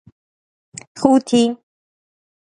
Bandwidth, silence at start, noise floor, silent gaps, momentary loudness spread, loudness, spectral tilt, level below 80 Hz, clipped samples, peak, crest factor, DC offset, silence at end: 11 kHz; 0.95 s; under -90 dBFS; none; 23 LU; -16 LUFS; -5 dB/octave; -60 dBFS; under 0.1%; 0 dBFS; 20 dB; under 0.1%; 1 s